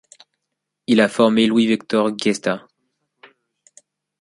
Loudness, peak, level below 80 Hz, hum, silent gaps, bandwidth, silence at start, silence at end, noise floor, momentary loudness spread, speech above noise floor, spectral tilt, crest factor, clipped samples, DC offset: -18 LUFS; -2 dBFS; -64 dBFS; none; none; 11.5 kHz; 0.9 s; 1.65 s; -79 dBFS; 10 LU; 62 dB; -5 dB/octave; 18 dB; under 0.1%; under 0.1%